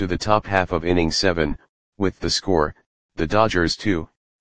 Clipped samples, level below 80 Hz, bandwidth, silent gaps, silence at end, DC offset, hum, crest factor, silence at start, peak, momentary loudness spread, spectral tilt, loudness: under 0.1%; -38 dBFS; 10 kHz; 1.69-1.93 s, 2.86-3.09 s; 0.25 s; 1%; none; 22 dB; 0 s; 0 dBFS; 9 LU; -4.5 dB/octave; -21 LUFS